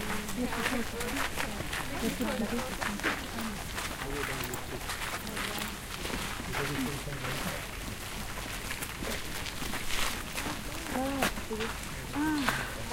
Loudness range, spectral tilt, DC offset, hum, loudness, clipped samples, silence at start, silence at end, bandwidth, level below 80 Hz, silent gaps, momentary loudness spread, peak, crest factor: 3 LU; -3.5 dB/octave; under 0.1%; none; -34 LUFS; under 0.1%; 0 s; 0 s; 17 kHz; -44 dBFS; none; 6 LU; -8 dBFS; 26 dB